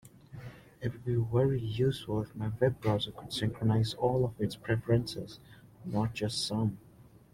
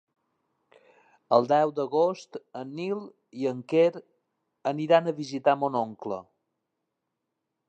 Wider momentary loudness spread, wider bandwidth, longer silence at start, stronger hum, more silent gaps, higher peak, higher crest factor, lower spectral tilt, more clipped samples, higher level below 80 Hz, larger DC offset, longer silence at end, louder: about the same, 18 LU vs 16 LU; first, 14.5 kHz vs 8.4 kHz; second, 0.05 s vs 1.3 s; neither; neither; second, -12 dBFS vs -6 dBFS; about the same, 20 dB vs 22 dB; about the same, -6.5 dB/octave vs -6.5 dB/octave; neither; first, -56 dBFS vs -80 dBFS; neither; second, 0.3 s vs 1.45 s; second, -32 LUFS vs -26 LUFS